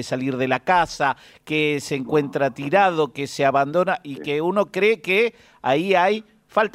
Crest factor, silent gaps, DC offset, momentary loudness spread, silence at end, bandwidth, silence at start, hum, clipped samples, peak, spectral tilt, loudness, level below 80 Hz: 16 dB; none; under 0.1%; 7 LU; 0.05 s; 15 kHz; 0 s; none; under 0.1%; -4 dBFS; -5 dB/octave; -21 LUFS; -58 dBFS